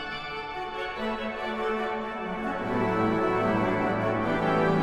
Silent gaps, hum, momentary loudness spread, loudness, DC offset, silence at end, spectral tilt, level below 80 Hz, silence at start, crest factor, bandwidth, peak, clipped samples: none; none; 8 LU; -28 LUFS; under 0.1%; 0 s; -7 dB/octave; -50 dBFS; 0 s; 14 dB; 12.5 kHz; -12 dBFS; under 0.1%